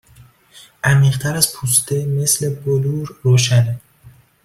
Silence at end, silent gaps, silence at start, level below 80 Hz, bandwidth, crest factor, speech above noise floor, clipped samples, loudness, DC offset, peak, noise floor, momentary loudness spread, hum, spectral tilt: 0.35 s; none; 0.2 s; -50 dBFS; 16 kHz; 18 dB; 31 dB; under 0.1%; -16 LUFS; under 0.1%; 0 dBFS; -47 dBFS; 8 LU; none; -4 dB/octave